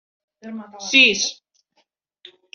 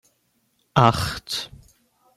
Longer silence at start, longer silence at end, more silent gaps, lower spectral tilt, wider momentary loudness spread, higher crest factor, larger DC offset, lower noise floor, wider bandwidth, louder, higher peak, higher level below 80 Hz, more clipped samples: second, 0.45 s vs 0.75 s; first, 1.2 s vs 0.7 s; neither; second, -0.5 dB/octave vs -5 dB/octave; first, 23 LU vs 11 LU; about the same, 22 dB vs 24 dB; neither; about the same, -68 dBFS vs -68 dBFS; second, 7.8 kHz vs 16 kHz; first, -15 LUFS vs -22 LUFS; about the same, -2 dBFS vs -2 dBFS; second, -66 dBFS vs -48 dBFS; neither